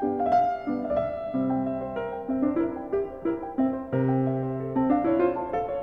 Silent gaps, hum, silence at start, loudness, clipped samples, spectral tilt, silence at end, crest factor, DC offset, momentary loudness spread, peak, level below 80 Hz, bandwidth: none; none; 0 s; -27 LUFS; under 0.1%; -10.5 dB/octave; 0 s; 16 dB; under 0.1%; 7 LU; -10 dBFS; -54 dBFS; 5.4 kHz